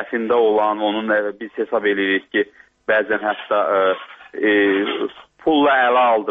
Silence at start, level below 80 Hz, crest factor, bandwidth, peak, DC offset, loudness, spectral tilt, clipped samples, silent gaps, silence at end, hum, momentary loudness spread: 0 s; -62 dBFS; 12 dB; 4.5 kHz; -6 dBFS; under 0.1%; -18 LUFS; -1.5 dB/octave; under 0.1%; none; 0 s; none; 12 LU